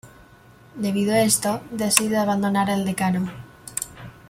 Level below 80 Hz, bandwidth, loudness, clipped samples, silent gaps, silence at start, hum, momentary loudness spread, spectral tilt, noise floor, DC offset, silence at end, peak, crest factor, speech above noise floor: -56 dBFS; 16.5 kHz; -22 LUFS; under 0.1%; none; 0.05 s; none; 13 LU; -4 dB/octave; -50 dBFS; under 0.1%; 0.15 s; 0 dBFS; 24 dB; 28 dB